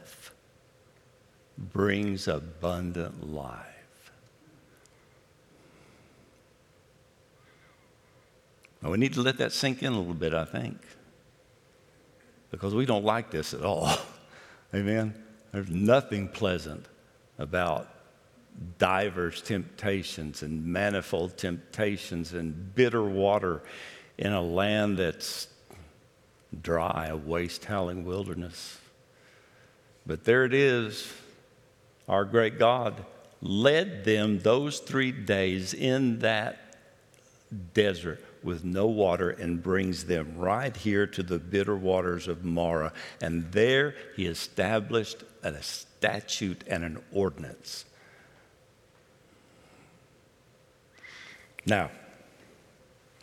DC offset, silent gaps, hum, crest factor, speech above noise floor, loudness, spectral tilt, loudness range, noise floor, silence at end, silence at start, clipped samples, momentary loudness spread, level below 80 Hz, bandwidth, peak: under 0.1%; none; none; 26 dB; 33 dB; -29 LUFS; -5.5 dB/octave; 9 LU; -61 dBFS; 1.1 s; 0 s; under 0.1%; 17 LU; -60 dBFS; 16 kHz; -6 dBFS